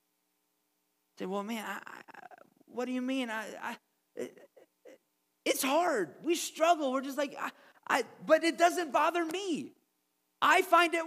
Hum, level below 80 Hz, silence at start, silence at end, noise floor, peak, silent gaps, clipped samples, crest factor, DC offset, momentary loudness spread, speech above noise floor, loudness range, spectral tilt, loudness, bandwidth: none; under -90 dBFS; 1.2 s; 0 s; -79 dBFS; -12 dBFS; none; under 0.1%; 22 dB; under 0.1%; 18 LU; 48 dB; 10 LU; -2.5 dB/octave; -31 LUFS; 15.5 kHz